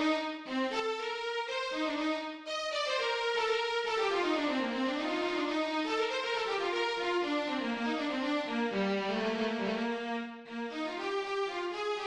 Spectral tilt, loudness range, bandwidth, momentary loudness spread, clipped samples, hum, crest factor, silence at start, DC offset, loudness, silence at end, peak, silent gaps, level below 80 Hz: -4 dB/octave; 2 LU; 11 kHz; 5 LU; under 0.1%; none; 14 dB; 0 s; under 0.1%; -33 LUFS; 0 s; -20 dBFS; none; -68 dBFS